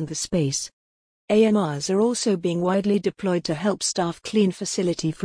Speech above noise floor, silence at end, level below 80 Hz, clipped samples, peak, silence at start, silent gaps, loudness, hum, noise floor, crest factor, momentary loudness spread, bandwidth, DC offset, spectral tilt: over 68 dB; 0 s; -56 dBFS; under 0.1%; -8 dBFS; 0 s; 0.73-1.28 s; -23 LUFS; none; under -90 dBFS; 16 dB; 5 LU; 10.5 kHz; under 0.1%; -5 dB/octave